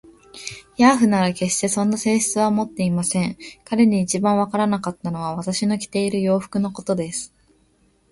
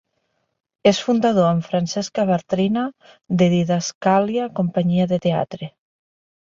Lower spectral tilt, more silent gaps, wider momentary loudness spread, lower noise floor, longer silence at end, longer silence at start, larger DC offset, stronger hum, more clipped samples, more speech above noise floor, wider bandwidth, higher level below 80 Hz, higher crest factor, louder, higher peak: about the same, -5 dB/octave vs -6 dB/octave; second, none vs 3.95-4.01 s; first, 11 LU vs 7 LU; second, -60 dBFS vs -71 dBFS; about the same, 0.85 s vs 0.8 s; second, 0.35 s vs 0.85 s; neither; neither; neither; second, 40 dB vs 52 dB; first, 11.5 kHz vs 7.6 kHz; about the same, -56 dBFS vs -58 dBFS; about the same, 20 dB vs 18 dB; about the same, -20 LUFS vs -20 LUFS; about the same, -2 dBFS vs -2 dBFS